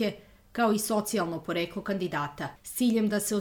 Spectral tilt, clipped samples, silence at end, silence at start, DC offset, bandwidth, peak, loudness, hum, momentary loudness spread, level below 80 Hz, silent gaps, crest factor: -4.5 dB/octave; under 0.1%; 0 s; 0 s; under 0.1%; over 20 kHz; -14 dBFS; -29 LUFS; none; 10 LU; -62 dBFS; none; 14 dB